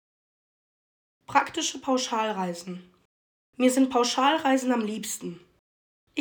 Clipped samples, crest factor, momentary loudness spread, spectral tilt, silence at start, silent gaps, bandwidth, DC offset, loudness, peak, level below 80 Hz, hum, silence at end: under 0.1%; 20 dB; 14 LU; -3 dB/octave; 1.3 s; 3.05-3.53 s, 5.59-6.07 s; over 20 kHz; under 0.1%; -26 LUFS; -8 dBFS; -72 dBFS; none; 0 s